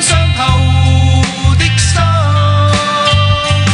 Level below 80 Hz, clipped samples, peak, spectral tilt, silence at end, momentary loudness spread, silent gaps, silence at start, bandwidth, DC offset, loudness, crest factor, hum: -22 dBFS; under 0.1%; 0 dBFS; -4.5 dB/octave; 0 s; 1 LU; none; 0 s; 11 kHz; under 0.1%; -10 LUFS; 10 dB; none